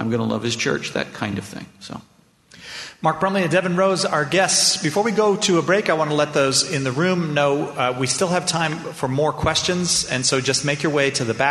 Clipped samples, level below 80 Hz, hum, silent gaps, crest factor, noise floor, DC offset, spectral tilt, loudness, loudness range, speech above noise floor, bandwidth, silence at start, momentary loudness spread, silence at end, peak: under 0.1%; -52 dBFS; none; none; 18 dB; -49 dBFS; under 0.1%; -3.5 dB/octave; -19 LUFS; 6 LU; 29 dB; 12.5 kHz; 0 s; 10 LU; 0 s; -2 dBFS